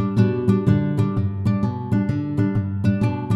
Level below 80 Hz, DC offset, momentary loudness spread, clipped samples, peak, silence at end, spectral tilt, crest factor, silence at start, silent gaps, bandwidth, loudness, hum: -44 dBFS; under 0.1%; 4 LU; under 0.1%; -4 dBFS; 0 s; -9.5 dB/octave; 16 dB; 0 s; none; 8 kHz; -21 LUFS; none